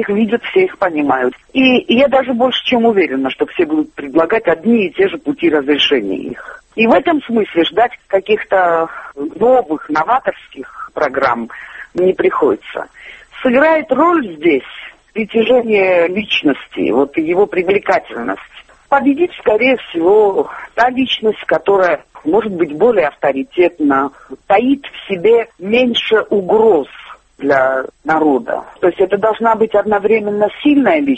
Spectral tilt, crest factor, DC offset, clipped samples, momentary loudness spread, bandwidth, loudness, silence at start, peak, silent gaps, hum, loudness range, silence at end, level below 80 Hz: -6 dB/octave; 14 dB; under 0.1%; under 0.1%; 11 LU; 8.4 kHz; -14 LUFS; 0 s; 0 dBFS; none; none; 2 LU; 0 s; -50 dBFS